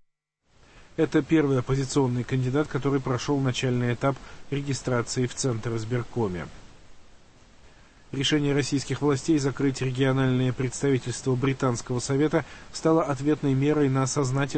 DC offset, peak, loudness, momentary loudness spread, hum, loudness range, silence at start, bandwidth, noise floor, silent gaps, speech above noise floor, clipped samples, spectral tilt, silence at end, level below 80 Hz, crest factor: under 0.1%; -10 dBFS; -26 LUFS; 7 LU; none; 5 LU; 0.75 s; 8.8 kHz; -70 dBFS; none; 45 dB; under 0.1%; -6 dB/octave; 0 s; -50 dBFS; 16 dB